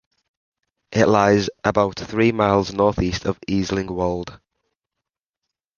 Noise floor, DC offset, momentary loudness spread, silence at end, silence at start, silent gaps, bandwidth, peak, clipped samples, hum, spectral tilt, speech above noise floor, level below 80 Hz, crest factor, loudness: -84 dBFS; under 0.1%; 9 LU; 1.4 s; 0.9 s; none; 7.2 kHz; -2 dBFS; under 0.1%; none; -6 dB/octave; 65 dB; -42 dBFS; 20 dB; -20 LUFS